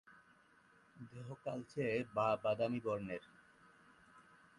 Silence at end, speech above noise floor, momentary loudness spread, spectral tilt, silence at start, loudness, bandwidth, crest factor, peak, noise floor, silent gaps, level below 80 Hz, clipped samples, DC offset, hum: 0.4 s; 29 dB; 16 LU; -7 dB/octave; 0.1 s; -40 LUFS; 11.5 kHz; 18 dB; -24 dBFS; -69 dBFS; none; -74 dBFS; under 0.1%; under 0.1%; none